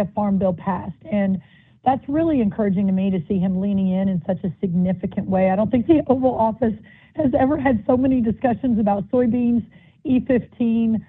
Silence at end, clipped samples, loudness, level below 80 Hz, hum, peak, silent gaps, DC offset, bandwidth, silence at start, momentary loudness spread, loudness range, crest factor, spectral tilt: 0.05 s; under 0.1%; -20 LUFS; -48 dBFS; none; -4 dBFS; none; under 0.1%; 3.9 kHz; 0 s; 6 LU; 2 LU; 16 dB; -12 dB/octave